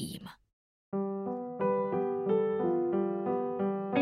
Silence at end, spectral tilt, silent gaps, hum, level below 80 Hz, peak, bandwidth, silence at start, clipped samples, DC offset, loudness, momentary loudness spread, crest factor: 0 s; -7.5 dB/octave; 0.53-0.92 s; none; -72 dBFS; -16 dBFS; 14.5 kHz; 0 s; under 0.1%; under 0.1%; -32 LUFS; 9 LU; 16 dB